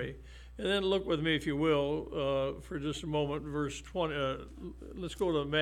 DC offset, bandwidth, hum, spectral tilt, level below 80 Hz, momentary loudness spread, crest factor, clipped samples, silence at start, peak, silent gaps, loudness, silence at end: under 0.1%; 13.5 kHz; none; -5.5 dB/octave; -50 dBFS; 13 LU; 16 dB; under 0.1%; 0 s; -16 dBFS; none; -33 LUFS; 0 s